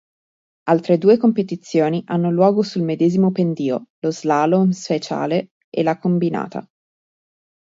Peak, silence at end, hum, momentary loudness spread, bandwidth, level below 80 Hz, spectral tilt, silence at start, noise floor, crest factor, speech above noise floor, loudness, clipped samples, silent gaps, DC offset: -2 dBFS; 1 s; none; 8 LU; 7.8 kHz; -66 dBFS; -7.5 dB/octave; 0.65 s; under -90 dBFS; 18 dB; over 72 dB; -19 LUFS; under 0.1%; 3.90-4.02 s, 5.51-5.72 s; under 0.1%